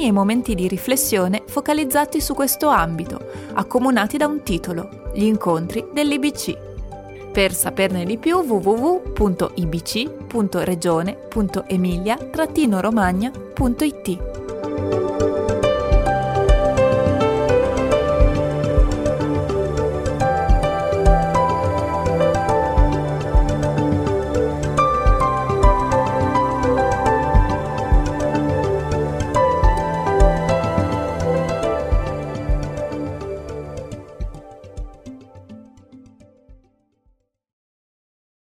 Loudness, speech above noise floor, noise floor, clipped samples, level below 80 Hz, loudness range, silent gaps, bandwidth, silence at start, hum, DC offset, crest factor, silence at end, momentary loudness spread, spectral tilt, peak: -19 LUFS; 43 dB; -63 dBFS; under 0.1%; -26 dBFS; 5 LU; none; 16.5 kHz; 0 s; none; under 0.1%; 18 dB; 2 s; 10 LU; -6 dB/octave; 0 dBFS